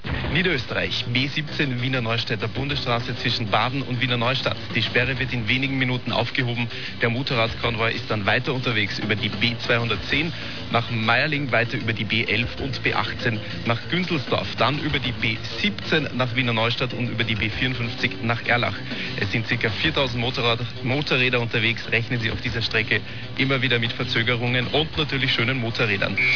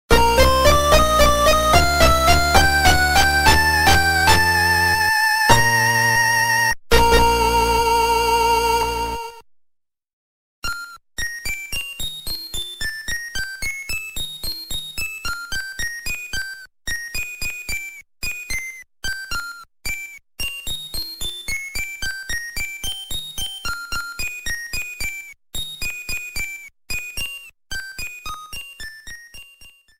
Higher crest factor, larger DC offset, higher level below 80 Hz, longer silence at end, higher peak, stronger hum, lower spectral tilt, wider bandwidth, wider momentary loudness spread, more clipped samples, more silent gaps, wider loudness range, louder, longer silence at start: about the same, 18 dB vs 20 dB; first, 2% vs under 0.1%; second, -46 dBFS vs -30 dBFS; second, 0 s vs 0.3 s; second, -6 dBFS vs 0 dBFS; neither; first, -6 dB/octave vs -3 dB/octave; second, 5.4 kHz vs 16.5 kHz; second, 4 LU vs 16 LU; neither; second, none vs 10.13-10.62 s; second, 2 LU vs 14 LU; second, -22 LUFS vs -19 LUFS; about the same, 0.05 s vs 0.1 s